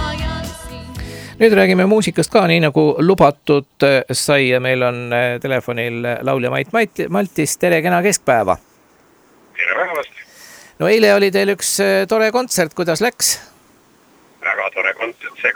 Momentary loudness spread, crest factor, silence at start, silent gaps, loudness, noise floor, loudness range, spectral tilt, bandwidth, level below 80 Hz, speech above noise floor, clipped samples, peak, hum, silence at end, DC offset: 12 LU; 16 dB; 0 s; none; -16 LUFS; -52 dBFS; 5 LU; -4 dB/octave; over 20 kHz; -42 dBFS; 36 dB; under 0.1%; 0 dBFS; none; 0 s; under 0.1%